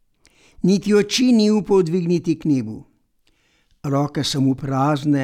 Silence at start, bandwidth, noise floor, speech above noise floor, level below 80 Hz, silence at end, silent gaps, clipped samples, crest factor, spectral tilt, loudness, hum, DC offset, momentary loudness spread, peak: 0.6 s; 15 kHz; -62 dBFS; 44 dB; -52 dBFS; 0 s; none; under 0.1%; 14 dB; -6 dB/octave; -19 LUFS; none; under 0.1%; 7 LU; -4 dBFS